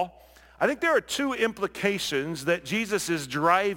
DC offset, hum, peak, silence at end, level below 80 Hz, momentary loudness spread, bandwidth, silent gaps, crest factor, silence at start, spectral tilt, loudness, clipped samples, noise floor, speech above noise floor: under 0.1%; none; -8 dBFS; 0 s; -60 dBFS; 5 LU; 17 kHz; none; 20 dB; 0 s; -4 dB/octave; -26 LUFS; under 0.1%; -53 dBFS; 27 dB